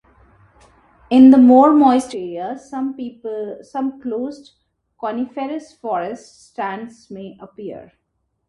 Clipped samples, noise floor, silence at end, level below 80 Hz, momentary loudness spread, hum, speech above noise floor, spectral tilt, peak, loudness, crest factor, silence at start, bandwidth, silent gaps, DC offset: under 0.1%; -71 dBFS; 0.65 s; -58 dBFS; 25 LU; none; 54 dB; -6 dB/octave; 0 dBFS; -16 LUFS; 18 dB; 1.1 s; 11 kHz; none; under 0.1%